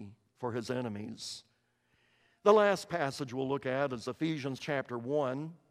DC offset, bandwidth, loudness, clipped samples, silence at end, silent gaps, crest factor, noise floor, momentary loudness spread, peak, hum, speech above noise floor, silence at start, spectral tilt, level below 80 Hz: under 0.1%; 14.5 kHz; -33 LUFS; under 0.1%; 0.15 s; none; 24 dB; -74 dBFS; 15 LU; -8 dBFS; none; 42 dB; 0 s; -5.5 dB/octave; -74 dBFS